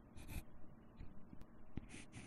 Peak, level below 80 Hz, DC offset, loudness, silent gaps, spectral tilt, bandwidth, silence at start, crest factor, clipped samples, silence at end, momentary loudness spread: -30 dBFS; -58 dBFS; under 0.1%; -57 LUFS; none; -5 dB/octave; 13 kHz; 0 s; 22 dB; under 0.1%; 0 s; 10 LU